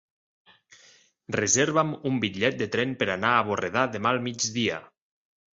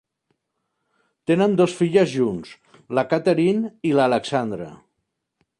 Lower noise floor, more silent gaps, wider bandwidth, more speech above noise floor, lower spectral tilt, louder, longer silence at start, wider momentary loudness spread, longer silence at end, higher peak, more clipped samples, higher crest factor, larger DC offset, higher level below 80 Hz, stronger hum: second, -58 dBFS vs -77 dBFS; neither; second, 8 kHz vs 11 kHz; second, 32 dB vs 57 dB; second, -3.5 dB/octave vs -6.5 dB/octave; second, -25 LUFS vs -20 LUFS; about the same, 1.3 s vs 1.3 s; second, 6 LU vs 13 LU; second, 0.7 s vs 0.85 s; about the same, -6 dBFS vs -4 dBFS; neither; about the same, 22 dB vs 18 dB; neither; about the same, -62 dBFS vs -62 dBFS; neither